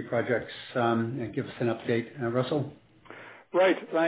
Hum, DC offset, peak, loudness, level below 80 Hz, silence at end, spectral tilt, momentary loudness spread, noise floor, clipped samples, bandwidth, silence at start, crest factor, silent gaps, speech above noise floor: none; under 0.1%; -12 dBFS; -29 LUFS; -66 dBFS; 0 s; -10.5 dB/octave; 18 LU; -49 dBFS; under 0.1%; 4 kHz; 0 s; 16 dB; none; 21 dB